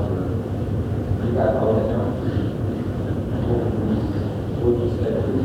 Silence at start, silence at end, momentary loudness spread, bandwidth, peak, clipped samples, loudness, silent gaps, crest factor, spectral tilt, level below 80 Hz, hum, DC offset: 0 s; 0 s; 5 LU; 10.5 kHz; -8 dBFS; under 0.1%; -23 LUFS; none; 14 dB; -9.5 dB/octave; -34 dBFS; none; under 0.1%